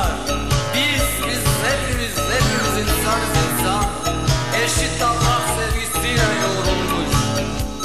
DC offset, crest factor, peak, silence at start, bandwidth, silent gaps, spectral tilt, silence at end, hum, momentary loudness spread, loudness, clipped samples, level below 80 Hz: 2%; 14 dB; -4 dBFS; 0 s; 14 kHz; none; -3.5 dB/octave; 0 s; none; 4 LU; -19 LUFS; under 0.1%; -28 dBFS